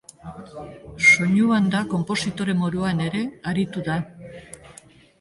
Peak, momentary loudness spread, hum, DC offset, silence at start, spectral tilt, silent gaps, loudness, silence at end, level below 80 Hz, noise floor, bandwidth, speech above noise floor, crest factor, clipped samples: -4 dBFS; 25 LU; none; under 0.1%; 0.25 s; -5 dB/octave; none; -21 LUFS; 0.5 s; -52 dBFS; -49 dBFS; 11.5 kHz; 27 dB; 20 dB; under 0.1%